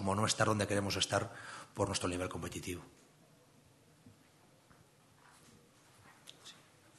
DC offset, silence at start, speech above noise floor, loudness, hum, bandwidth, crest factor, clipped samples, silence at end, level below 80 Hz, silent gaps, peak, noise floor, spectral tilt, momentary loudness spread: under 0.1%; 0 s; 29 dB; -36 LUFS; none; 12.5 kHz; 24 dB; under 0.1%; 0.45 s; -68 dBFS; none; -16 dBFS; -65 dBFS; -4 dB/octave; 23 LU